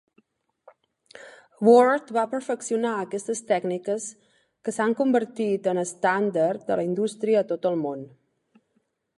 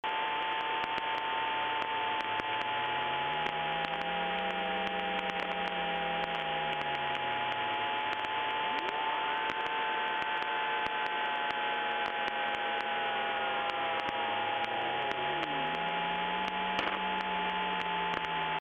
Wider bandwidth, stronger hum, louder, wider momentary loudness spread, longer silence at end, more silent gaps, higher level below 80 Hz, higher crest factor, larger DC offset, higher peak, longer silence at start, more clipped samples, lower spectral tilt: first, 11.5 kHz vs 8.4 kHz; neither; first, -24 LUFS vs -32 LUFS; first, 12 LU vs 1 LU; first, 1.1 s vs 0 s; neither; second, -76 dBFS vs -66 dBFS; about the same, 20 dB vs 18 dB; neither; first, -4 dBFS vs -16 dBFS; first, 1.2 s vs 0.05 s; neither; about the same, -5.5 dB/octave vs -4.5 dB/octave